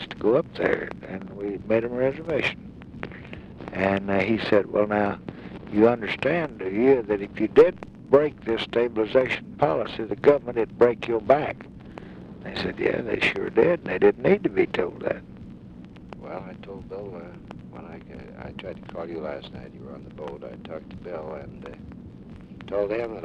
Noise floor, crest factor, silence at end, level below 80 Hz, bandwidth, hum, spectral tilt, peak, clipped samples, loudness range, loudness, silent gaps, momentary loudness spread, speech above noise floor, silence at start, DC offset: -43 dBFS; 18 dB; 0 s; -52 dBFS; 8.8 kHz; none; -7.5 dB/octave; -6 dBFS; under 0.1%; 15 LU; -24 LUFS; none; 21 LU; 19 dB; 0 s; under 0.1%